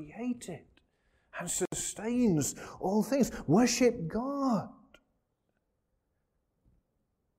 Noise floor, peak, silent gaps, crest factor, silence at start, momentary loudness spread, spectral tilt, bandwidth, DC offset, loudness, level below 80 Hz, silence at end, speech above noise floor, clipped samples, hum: -79 dBFS; -14 dBFS; none; 18 dB; 0 s; 15 LU; -5 dB/octave; 16 kHz; under 0.1%; -31 LUFS; -60 dBFS; 2.65 s; 49 dB; under 0.1%; none